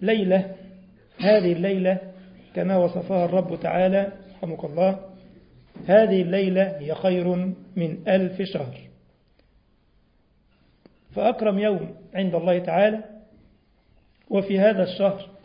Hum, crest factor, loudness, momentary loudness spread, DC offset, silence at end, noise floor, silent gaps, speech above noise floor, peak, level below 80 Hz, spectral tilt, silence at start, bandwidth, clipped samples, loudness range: none; 20 dB; -23 LUFS; 13 LU; under 0.1%; 0.15 s; -62 dBFS; none; 40 dB; -4 dBFS; -60 dBFS; -11.5 dB/octave; 0 s; 5.2 kHz; under 0.1%; 7 LU